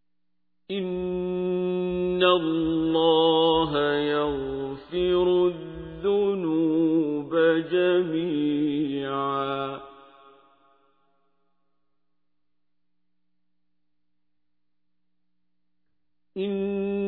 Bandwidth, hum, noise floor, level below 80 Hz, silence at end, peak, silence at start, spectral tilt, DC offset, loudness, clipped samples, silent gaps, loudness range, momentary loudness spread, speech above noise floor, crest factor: 4.5 kHz; 60 Hz at -55 dBFS; -84 dBFS; -54 dBFS; 0 s; -8 dBFS; 0.7 s; -9.5 dB/octave; under 0.1%; -24 LUFS; under 0.1%; none; 12 LU; 11 LU; 60 dB; 18 dB